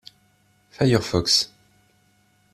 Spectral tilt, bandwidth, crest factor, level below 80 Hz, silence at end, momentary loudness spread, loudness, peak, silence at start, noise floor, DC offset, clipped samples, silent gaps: -4 dB/octave; 14 kHz; 22 dB; -50 dBFS; 1.1 s; 6 LU; -21 LUFS; -4 dBFS; 0.8 s; -62 dBFS; under 0.1%; under 0.1%; none